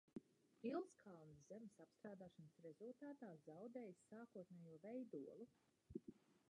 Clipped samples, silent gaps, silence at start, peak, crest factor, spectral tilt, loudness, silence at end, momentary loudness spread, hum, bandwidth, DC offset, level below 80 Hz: under 0.1%; none; 0.15 s; -38 dBFS; 20 dB; -7.5 dB/octave; -58 LUFS; 0.1 s; 12 LU; none; 10.5 kHz; under 0.1%; -86 dBFS